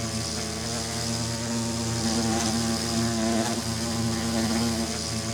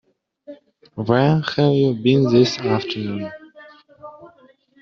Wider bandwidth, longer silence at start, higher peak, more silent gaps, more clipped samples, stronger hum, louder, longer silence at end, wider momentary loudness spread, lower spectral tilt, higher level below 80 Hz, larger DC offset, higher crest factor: first, 19.5 kHz vs 7.2 kHz; second, 0 s vs 0.5 s; second, -12 dBFS vs -2 dBFS; neither; neither; neither; second, -26 LUFS vs -18 LUFS; second, 0 s vs 0.55 s; second, 4 LU vs 23 LU; second, -4 dB/octave vs -6 dB/octave; first, -48 dBFS vs -58 dBFS; neither; about the same, 14 dB vs 18 dB